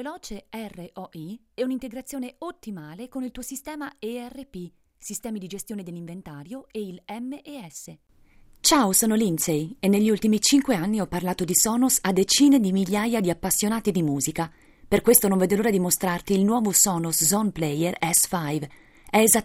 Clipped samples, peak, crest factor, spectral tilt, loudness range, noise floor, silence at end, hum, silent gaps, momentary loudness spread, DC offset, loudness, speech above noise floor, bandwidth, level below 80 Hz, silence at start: under 0.1%; -2 dBFS; 22 dB; -3.5 dB/octave; 15 LU; -53 dBFS; 0 s; none; none; 20 LU; under 0.1%; -22 LUFS; 30 dB; 16 kHz; -52 dBFS; 0 s